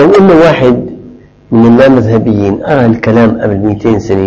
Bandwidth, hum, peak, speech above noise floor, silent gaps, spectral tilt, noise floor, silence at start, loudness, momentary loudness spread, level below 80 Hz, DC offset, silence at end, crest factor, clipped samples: 7.6 kHz; none; 0 dBFS; 27 dB; none; -8 dB/octave; -33 dBFS; 0 s; -7 LUFS; 7 LU; -34 dBFS; under 0.1%; 0 s; 6 dB; 3%